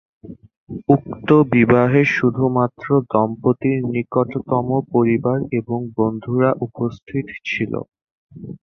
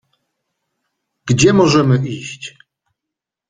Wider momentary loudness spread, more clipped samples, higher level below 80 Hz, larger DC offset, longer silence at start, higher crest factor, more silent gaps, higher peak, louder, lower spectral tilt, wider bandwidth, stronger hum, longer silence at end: second, 12 LU vs 21 LU; neither; about the same, -52 dBFS vs -48 dBFS; neither; second, 0.25 s vs 1.25 s; about the same, 18 dB vs 16 dB; first, 0.57-0.67 s, 7.03-7.07 s, 8.11-8.29 s vs none; about the same, -2 dBFS vs -2 dBFS; second, -19 LUFS vs -13 LUFS; first, -9 dB/octave vs -5.5 dB/octave; second, 6.6 kHz vs 9.6 kHz; neither; second, 0.05 s vs 1 s